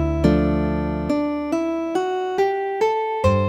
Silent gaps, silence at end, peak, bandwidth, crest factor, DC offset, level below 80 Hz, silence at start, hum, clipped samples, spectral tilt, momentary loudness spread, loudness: none; 0 s; -4 dBFS; 13.5 kHz; 16 dB; under 0.1%; -32 dBFS; 0 s; none; under 0.1%; -7.5 dB/octave; 5 LU; -21 LUFS